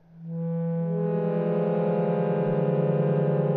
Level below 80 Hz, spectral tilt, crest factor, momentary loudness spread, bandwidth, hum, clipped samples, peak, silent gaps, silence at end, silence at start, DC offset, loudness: -70 dBFS; -13 dB/octave; 12 dB; 5 LU; 4 kHz; none; under 0.1%; -12 dBFS; none; 0 s; 0.15 s; under 0.1%; -26 LUFS